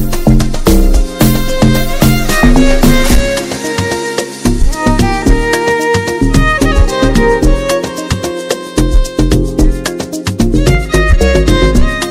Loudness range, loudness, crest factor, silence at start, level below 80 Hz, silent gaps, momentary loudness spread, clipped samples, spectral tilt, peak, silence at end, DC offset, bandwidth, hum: 3 LU; -11 LUFS; 10 dB; 0 s; -12 dBFS; none; 7 LU; 2%; -5.5 dB/octave; 0 dBFS; 0 s; under 0.1%; 16.5 kHz; none